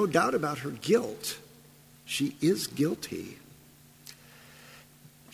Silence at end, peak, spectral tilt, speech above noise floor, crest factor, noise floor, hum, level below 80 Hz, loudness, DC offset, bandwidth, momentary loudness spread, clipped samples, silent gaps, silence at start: 0.25 s; -8 dBFS; -4.5 dB/octave; 27 dB; 22 dB; -56 dBFS; none; -68 dBFS; -30 LUFS; under 0.1%; 16 kHz; 24 LU; under 0.1%; none; 0 s